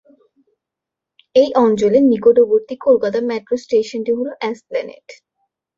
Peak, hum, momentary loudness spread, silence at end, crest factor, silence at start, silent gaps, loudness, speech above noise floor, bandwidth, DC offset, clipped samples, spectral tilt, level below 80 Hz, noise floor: -2 dBFS; none; 13 LU; 0.65 s; 16 dB; 1.35 s; none; -16 LUFS; 69 dB; 7.6 kHz; under 0.1%; under 0.1%; -6 dB/octave; -60 dBFS; -84 dBFS